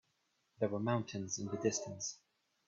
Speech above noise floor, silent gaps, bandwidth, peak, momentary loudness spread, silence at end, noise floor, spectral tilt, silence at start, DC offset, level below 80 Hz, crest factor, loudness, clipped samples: 42 dB; none; 7.8 kHz; -20 dBFS; 7 LU; 0.5 s; -80 dBFS; -4.5 dB/octave; 0.6 s; under 0.1%; -76 dBFS; 20 dB; -39 LUFS; under 0.1%